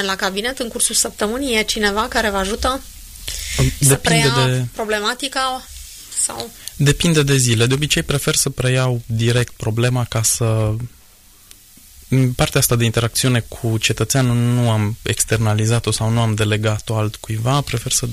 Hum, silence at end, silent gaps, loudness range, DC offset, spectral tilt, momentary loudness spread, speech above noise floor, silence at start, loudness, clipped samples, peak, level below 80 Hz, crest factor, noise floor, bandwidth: none; 0 s; none; 2 LU; under 0.1%; -4 dB/octave; 8 LU; 29 dB; 0 s; -17 LUFS; under 0.1%; -2 dBFS; -36 dBFS; 16 dB; -47 dBFS; 15.5 kHz